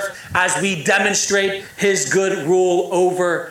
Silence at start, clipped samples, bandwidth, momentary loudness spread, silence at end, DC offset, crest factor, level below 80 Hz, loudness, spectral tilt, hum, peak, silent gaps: 0 s; under 0.1%; 16 kHz; 4 LU; 0 s; under 0.1%; 14 dB; -58 dBFS; -17 LUFS; -3 dB/octave; none; -4 dBFS; none